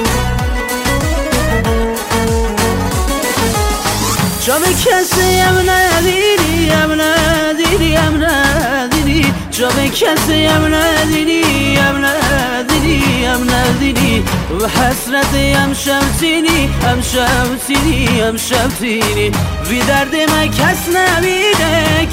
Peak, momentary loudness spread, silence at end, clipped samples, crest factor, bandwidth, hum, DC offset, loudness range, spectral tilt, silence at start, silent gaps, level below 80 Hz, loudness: 0 dBFS; 4 LU; 0 s; under 0.1%; 12 dB; 16.5 kHz; none; under 0.1%; 3 LU; -4 dB/octave; 0 s; none; -24 dBFS; -12 LUFS